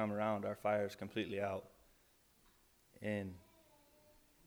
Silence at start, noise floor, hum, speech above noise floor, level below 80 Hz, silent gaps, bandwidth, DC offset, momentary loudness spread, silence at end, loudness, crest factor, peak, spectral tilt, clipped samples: 0 s; -71 dBFS; none; 31 dB; -76 dBFS; none; over 20 kHz; under 0.1%; 10 LU; 1.05 s; -41 LUFS; 20 dB; -24 dBFS; -6.5 dB/octave; under 0.1%